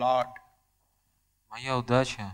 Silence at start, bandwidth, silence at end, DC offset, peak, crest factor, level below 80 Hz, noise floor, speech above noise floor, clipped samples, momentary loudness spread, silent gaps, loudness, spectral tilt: 0 s; 16 kHz; 0 s; under 0.1%; -8 dBFS; 22 dB; -58 dBFS; -72 dBFS; 45 dB; under 0.1%; 12 LU; none; -29 LUFS; -5.5 dB/octave